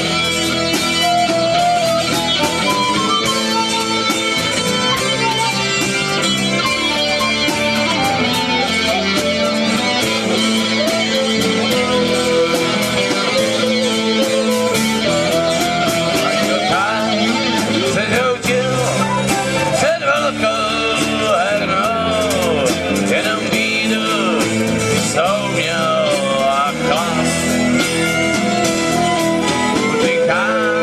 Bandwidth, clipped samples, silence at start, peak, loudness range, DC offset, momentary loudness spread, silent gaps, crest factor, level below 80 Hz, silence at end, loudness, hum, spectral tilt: 15.5 kHz; under 0.1%; 0 s; -2 dBFS; 1 LU; under 0.1%; 1 LU; none; 14 dB; -44 dBFS; 0 s; -15 LUFS; none; -3.5 dB/octave